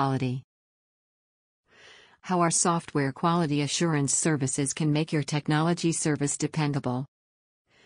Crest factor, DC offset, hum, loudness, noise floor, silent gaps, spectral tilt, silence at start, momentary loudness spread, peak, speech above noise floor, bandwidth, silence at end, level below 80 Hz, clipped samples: 18 dB; under 0.1%; none; -26 LUFS; -54 dBFS; 0.44-1.64 s; -4.5 dB/octave; 0 s; 7 LU; -10 dBFS; 28 dB; 10 kHz; 0.8 s; -64 dBFS; under 0.1%